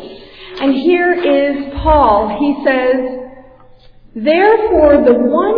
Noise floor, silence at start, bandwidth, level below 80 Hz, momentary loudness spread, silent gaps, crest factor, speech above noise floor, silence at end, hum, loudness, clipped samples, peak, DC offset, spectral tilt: -41 dBFS; 0 s; 5.2 kHz; -30 dBFS; 12 LU; none; 12 dB; 30 dB; 0 s; none; -12 LUFS; under 0.1%; 0 dBFS; under 0.1%; -9 dB/octave